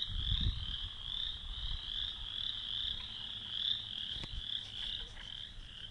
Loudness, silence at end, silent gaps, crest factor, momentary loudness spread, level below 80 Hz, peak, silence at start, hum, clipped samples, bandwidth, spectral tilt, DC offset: -38 LUFS; 0 s; none; 18 dB; 9 LU; -46 dBFS; -22 dBFS; 0 s; none; under 0.1%; 11.5 kHz; -3.5 dB/octave; under 0.1%